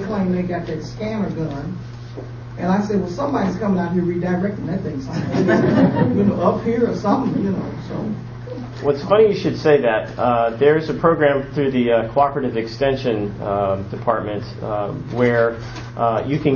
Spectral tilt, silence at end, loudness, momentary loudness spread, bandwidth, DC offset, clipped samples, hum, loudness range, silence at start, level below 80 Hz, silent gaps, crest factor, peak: -8 dB/octave; 0 s; -19 LUFS; 12 LU; 7 kHz; under 0.1%; under 0.1%; none; 5 LU; 0 s; -44 dBFS; none; 18 dB; -2 dBFS